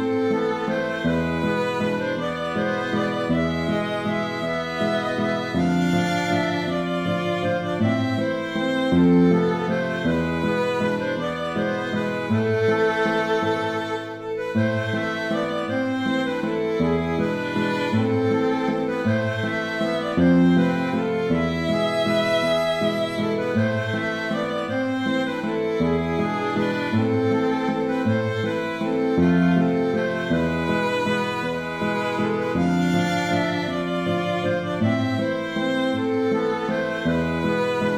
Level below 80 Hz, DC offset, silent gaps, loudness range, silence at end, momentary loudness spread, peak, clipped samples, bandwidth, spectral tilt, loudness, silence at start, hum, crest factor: -50 dBFS; under 0.1%; none; 3 LU; 0 s; 5 LU; -8 dBFS; under 0.1%; 14 kHz; -6.5 dB/octave; -23 LUFS; 0 s; none; 14 dB